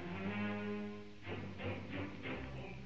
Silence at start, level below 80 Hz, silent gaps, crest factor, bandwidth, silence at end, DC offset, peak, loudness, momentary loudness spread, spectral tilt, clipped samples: 0 s; -62 dBFS; none; 14 dB; 7.6 kHz; 0 s; 0.2%; -30 dBFS; -44 LUFS; 7 LU; -7.5 dB/octave; under 0.1%